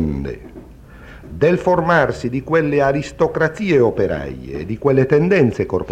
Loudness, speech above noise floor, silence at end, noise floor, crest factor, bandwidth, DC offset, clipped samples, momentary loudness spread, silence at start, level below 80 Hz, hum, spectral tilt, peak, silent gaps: -17 LUFS; 23 dB; 0 s; -39 dBFS; 16 dB; 9.4 kHz; under 0.1%; under 0.1%; 13 LU; 0 s; -38 dBFS; none; -7.5 dB/octave; -2 dBFS; none